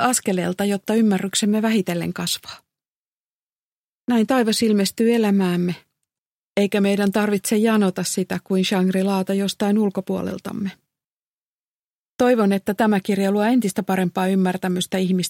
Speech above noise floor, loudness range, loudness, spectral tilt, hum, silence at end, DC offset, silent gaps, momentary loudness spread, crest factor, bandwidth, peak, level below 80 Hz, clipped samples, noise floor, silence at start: over 70 dB; 4 LU; -20 LUFS; -5 dB/octave; none; 0 s; under 0.1%; 2.88-4.05 s, 6.18-6.56 s, 11.10-11.58 s, 11.64-12.17 s; 8 LU; 16 dB; 16.5 kHz; -6 dBFS; -64 dBFS; under 0.1%; under -90 dBFS; 0 s